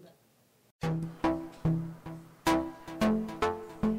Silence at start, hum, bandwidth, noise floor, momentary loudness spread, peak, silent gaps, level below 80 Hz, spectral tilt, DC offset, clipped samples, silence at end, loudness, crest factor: 0 s; none; 16 kHz; -66 dBFS; 11 LU; -16 dBFS; 0.71-0.79 s; -52 dBFS; -6.5 dB/octave; under 0.1%; under 0.1%; 0 s; -32 LUFS; 16 dB